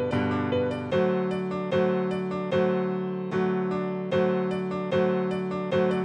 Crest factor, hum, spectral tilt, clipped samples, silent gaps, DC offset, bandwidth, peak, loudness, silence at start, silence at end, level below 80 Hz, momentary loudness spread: 12 dB; none; -8 dB/octave; under 0.1%; none; under 0.1%; 9.8 kHz; -14 dBFS; -27 LUFS; 0 s; 0 s; -62 dBFS; 5 LU